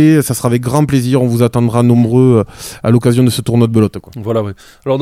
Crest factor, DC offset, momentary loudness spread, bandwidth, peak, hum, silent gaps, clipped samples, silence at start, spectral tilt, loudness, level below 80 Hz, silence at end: 12 dB; under 0.1%; 9 LU; 15.5 kHz; 0 dBFS; none; none; under 0.1%; 0 s; -7 dB/octave; -12 LUFS; -42 dBFS; 0 s